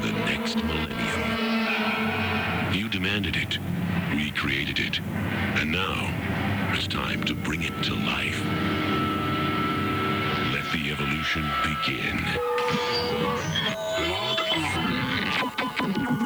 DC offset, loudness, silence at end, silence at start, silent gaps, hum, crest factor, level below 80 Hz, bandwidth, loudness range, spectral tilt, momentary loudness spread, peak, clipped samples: under 0.1%; -26 LUFS; 0 s; 0 s; none; none; 14 dB; -46 dBFS; over 20 kHz; 1 LU; -5 dB/octave; 3 LU; -12 dBFS; under 0.1%